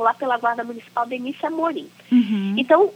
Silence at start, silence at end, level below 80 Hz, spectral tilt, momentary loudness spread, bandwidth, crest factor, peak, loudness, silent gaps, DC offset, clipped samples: 0 s; 0 s; -82 dBFS; -7 dB/octave; 10 LU; 8.6 kHz; 18 dB; -2 dBFS; -22 LUFS; none; under 0.1%; under 0.1%